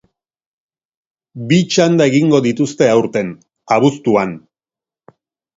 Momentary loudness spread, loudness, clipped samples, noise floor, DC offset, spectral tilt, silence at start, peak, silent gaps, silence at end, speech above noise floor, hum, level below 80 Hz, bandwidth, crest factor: 12 LU; -14 LUFS; under 0.1%; under -90 dBFS; under 0.1%; -6 dB/octave; 1.35 s; 0 dBFS; none; 1.2 s; over 77 dB; none; -58 dBFS; 7.8 kHz; 16 dB